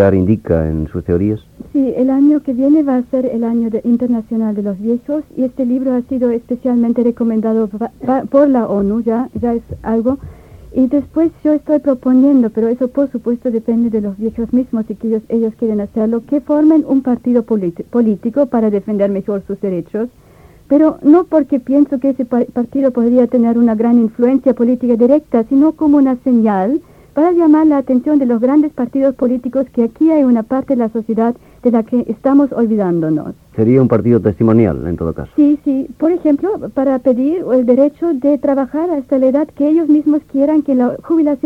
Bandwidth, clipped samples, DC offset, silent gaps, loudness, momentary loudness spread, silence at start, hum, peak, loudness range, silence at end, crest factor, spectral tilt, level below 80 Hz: 3.8 kHz; under 0.1%; under 0.1%; none; -14 LUFS; 7 LU; 0 s; none; 0 dBFS; 4 LU; 0.1 s; 14 dB; -10.5 dB/octave; -42 dBFS